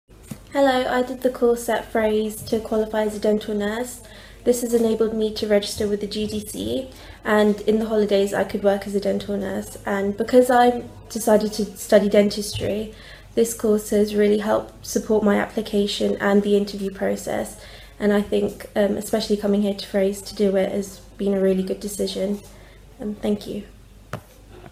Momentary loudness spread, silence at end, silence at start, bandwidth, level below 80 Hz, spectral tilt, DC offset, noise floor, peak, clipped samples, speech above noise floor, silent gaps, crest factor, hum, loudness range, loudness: 11 LU; 0.05 s; 0.2 s; 16 kHz; -48 dBFS; -5 dB/octave; under 0.1%; -44 dBFS; -2 dBFS; under 0.1%; 23 dB; none; 20 dB; none; 4 LU; -22 LUFS